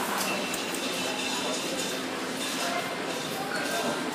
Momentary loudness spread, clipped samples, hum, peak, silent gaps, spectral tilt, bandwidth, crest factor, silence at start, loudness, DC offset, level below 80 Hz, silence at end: 3 LU; under 0.1%; none; -14 dBFS; none; -2 dB/octave; 15.5 kHz; 18 dB; 0 s; -29 LUFS; under 0.1%; -70 dBFS; 0 s